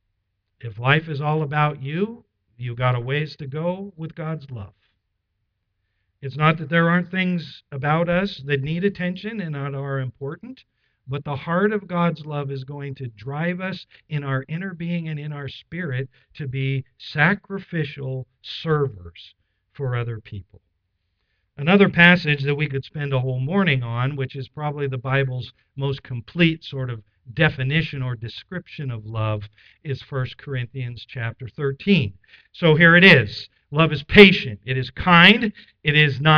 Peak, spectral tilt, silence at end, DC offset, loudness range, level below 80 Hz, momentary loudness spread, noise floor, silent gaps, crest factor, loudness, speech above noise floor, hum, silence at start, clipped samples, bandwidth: 0 dBFS; -8 dB/octave; 0 s; under 0.1%; 13 LU; -50 dBFS; 20 LU; -75 dBFS; none; 22 dB; -20 LUFS; 54 dB; none; 0.65 s; under 0.1%; 5.4 kHz